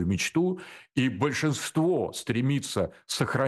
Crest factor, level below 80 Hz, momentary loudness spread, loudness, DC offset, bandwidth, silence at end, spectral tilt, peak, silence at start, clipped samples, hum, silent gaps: 14 dB; -58 dBFS; 5 LU; -28 LUFS; under 0.1%; 12.5 kHz; 0 s; -5 dB/octave; -12 dBFS; 0 s; under 0.1%; none; none